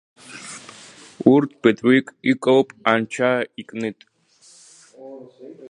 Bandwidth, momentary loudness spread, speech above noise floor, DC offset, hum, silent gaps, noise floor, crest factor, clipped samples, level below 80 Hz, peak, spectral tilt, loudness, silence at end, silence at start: 11 kHz; 24 LU; 34 dB; under 0.1%; none; none; -53 dBFS; 22 dB; under 0.1%; -70 dBFS; 0 dBFS; -5.5 dB/octave; -19 LUFS; 0.05 s; 0.3 s